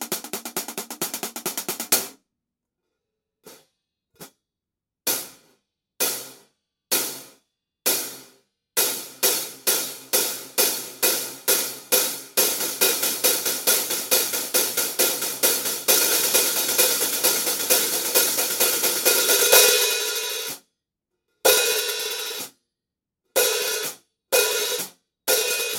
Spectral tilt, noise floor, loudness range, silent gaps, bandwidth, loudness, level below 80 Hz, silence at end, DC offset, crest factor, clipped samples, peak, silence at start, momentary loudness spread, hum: 1 dB/octave; -87 dBFS; 12 LU; none; 17 kHz; -20 LUFS; -70 dBFS; 0 s; under 0.1%; 22 dB; under 0.1%; -2 dBFS; 0 s; 12 LU; none